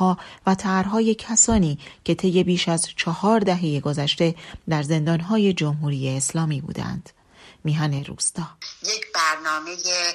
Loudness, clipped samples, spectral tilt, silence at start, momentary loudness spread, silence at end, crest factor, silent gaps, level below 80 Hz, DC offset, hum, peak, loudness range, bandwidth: -22 LUFS; under 0.1%; -4 dB/octave; 0 s; 9 LU; 0 s; 18 dB; none; -46 dBFS; under 0.1%; none; -4 dBFS; 5 LU; 13.5 kHz